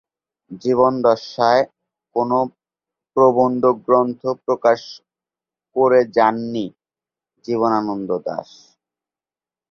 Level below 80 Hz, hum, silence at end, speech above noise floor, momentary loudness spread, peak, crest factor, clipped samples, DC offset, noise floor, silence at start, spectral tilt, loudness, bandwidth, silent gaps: -64 dBFS; none; 1.3 s; over 73 dB; 12 LU; -2 dBFS; 18 dB; under 0.1%; under 0.1%; under -90 dBFS; 0.5 s; -6.5 dB/octave; -18 LUFS; 6.8 kHz; none